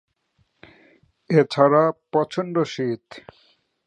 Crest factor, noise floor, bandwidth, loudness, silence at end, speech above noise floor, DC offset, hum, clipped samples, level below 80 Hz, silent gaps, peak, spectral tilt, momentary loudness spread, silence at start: 22 dB; -68 dBFS; 9.4 kHz; -21 LUFS; 0.7 s; 47 dB; under 0.1%; none; under 0.1%; -68 dBFS; none; -2 dBFS; -7 dB/octave; 16 LU; 1.3 s